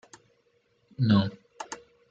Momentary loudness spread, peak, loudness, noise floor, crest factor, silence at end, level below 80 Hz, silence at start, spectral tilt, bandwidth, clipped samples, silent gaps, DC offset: 20 LU; -10 dBFS; -26 LUFS; -69 dBFS; 20 dB; 0.35 s; -68 dBFS; 1 s; -6.5 dB/octave; 8 kHz; under 0.1%; none; under 0.1%